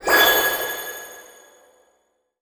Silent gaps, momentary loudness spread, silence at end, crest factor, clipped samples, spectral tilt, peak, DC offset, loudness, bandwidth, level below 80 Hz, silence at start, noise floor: none; 21 LU; 1.2 s; 22 dB; under 0.1%; 0 dB/octave; -2 dBFS; under 0.1%; -18 LUFS; over 20 kHz; -54 dBFS; 0 s; -68 dBFS